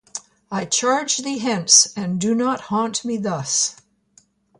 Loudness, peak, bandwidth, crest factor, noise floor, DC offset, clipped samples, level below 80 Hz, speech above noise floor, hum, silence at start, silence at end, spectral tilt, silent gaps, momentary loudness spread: -19 LUFS; 0 dBFS; 11.5 kHz; 22 dB; -57 dBFS; under 0.1%; under 0.1%; -64 dBFS; 37 dB; none; 0.15 s; 0.85 s; -2 dB/octave; none; 14 LU